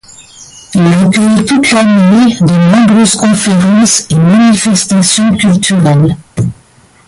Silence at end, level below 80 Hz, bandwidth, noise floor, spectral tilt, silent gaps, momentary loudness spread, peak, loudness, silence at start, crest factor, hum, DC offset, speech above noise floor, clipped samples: 0.55 s; -40 dBFS; 11.5 kHz; -43 dBFS; -5 dB/octave; none; 5 LU; 0 dBFS; -7 LUFS; 0.2 s; 8 dB; none; under 0.1%; 36 dB; under 0.1%